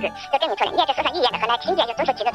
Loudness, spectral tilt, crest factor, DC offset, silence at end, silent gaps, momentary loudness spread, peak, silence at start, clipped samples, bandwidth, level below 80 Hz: -21 LUFS; -3.5 dB/octave; 16 dB; under 0.1%; 0 s; none; 3 LU; -6 dBFS; 0 s; under 0.1%; 13 kHz; -56 dBFS